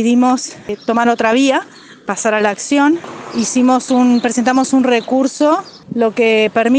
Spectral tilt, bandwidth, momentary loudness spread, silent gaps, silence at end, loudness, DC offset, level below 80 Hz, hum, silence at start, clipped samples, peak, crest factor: -3.5 dB/octave; 9.8 kHz; 10 LU; none; 0 s; -14 LUFS; under 0.1%; -60 dBFS; none; 0 s; under 0.1%; 0 dBFS; 14 dB